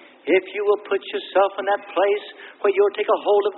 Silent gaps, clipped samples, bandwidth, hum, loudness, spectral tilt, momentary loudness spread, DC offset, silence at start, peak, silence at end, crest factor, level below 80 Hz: none; under 0.1%; 4.2 kHz; none; -21 LUFS; -8 dB/octave; 6 LU; under 0.1%; 0.25 s; -6 dBFS; 0 s; 16 dB; -76 dBFS